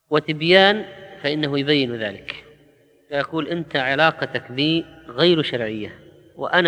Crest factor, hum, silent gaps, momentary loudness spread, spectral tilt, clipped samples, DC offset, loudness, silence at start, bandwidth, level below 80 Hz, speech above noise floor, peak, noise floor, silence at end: 22 dB; none; none; 17 LU; -6 dB/octave; under 0.1%; under 0.1%; -20 LUFS; 0.1 s; 9.8 kHz; -60 dBFS; 35 dB; 0 dBFS; -55 dBFS; 0 s